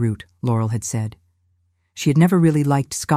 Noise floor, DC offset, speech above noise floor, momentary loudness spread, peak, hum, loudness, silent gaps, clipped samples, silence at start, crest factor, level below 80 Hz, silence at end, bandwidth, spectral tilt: -65 dBFS; under 0.1%; 47 dB; 12 LU; -2 dBFS; none; -19 LUFS; none; under 0.1%; 0 s; 16 dB; -54 dBFS; 0 s; 15.5 kHz; -6.5 dB/octave